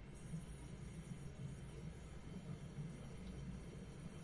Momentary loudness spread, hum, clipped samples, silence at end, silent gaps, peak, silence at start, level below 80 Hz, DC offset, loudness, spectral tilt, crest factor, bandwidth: 3 LU; none; under 0.1%; 0 s; none; -38 dBFS; 0 s; -58 dBFS; under 0.1%; -53 LUFS; -6.5 dB/octave; 14 dB; 11.5 kHz